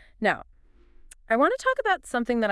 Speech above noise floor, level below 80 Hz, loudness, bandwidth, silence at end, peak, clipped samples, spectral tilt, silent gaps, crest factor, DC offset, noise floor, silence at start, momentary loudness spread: 29 dB; -54 dBFS; -25 LUFS; 12 kHz; 0 s; -8 dBFS; under 0.1%; -4.5 dB/octave; none; 18 dB; under 0.1%; -53 dBFS; 0.2 s; 5 LU